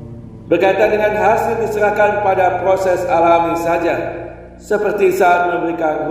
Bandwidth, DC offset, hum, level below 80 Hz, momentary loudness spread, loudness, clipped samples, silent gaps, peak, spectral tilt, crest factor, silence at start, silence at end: 16 kHz; under 0.1%; none; -42 dBFS; 8 LU; -15 LUFS; under 0.1%; none; 0 dBFS; -6 dB/octave; 14 dB; 0 s; 0 s